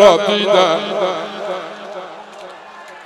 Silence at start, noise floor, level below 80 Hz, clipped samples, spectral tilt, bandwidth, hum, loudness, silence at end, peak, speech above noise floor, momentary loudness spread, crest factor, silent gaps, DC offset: 0 s; -36 dBFS; -58 dBFS; 0.2%; -3.5 dB/octave; 12 kHz; none; -16 LUFS; 0 s; 0 dBFS; 23 dB; 22 LU; 16 dB; none; under 0.1%